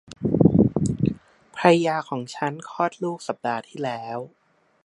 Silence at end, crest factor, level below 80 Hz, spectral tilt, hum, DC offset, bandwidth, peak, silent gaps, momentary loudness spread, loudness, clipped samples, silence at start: 0.55 s; 22 dB; -48 dBFS; -7 dB/octave; none; under 0.1%; 11 kHz; -2 dBFS; none; 15 LU; -23 LUFS; under 0.1%; 0.1 s